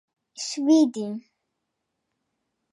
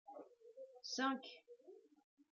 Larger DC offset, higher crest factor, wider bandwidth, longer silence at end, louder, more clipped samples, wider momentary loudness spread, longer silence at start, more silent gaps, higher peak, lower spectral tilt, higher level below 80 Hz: neither; about the same, 18 dB vs 22 dB; first, 11 kHz vs 7.4 kHz; first, 1.55 s vs 0.5 s; first, -23 LUFS vs -43 LUFS; neither; second, 15 LU vs 22 LU; first, 0.4 s vs 0.05 s; neither; first, -10 dBFS vs -28 dBFS; first, -4.5 dB/octave vs 0 dB/octave; first, -84 dBFS vs under -90 dBFS